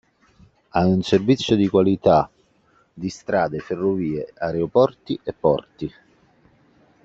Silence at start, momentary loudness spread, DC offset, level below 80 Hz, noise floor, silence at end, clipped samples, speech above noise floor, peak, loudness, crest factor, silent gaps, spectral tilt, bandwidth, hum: 0.75 s; 14 LU; under 0.1%; -52 dBFS; -60 dBFS; 1.15 s; under 0.1%; 40 dB; -2 dBFS; -21 LUFS; 18 dB; none; -7 dB/octave; 7.8 kHz; none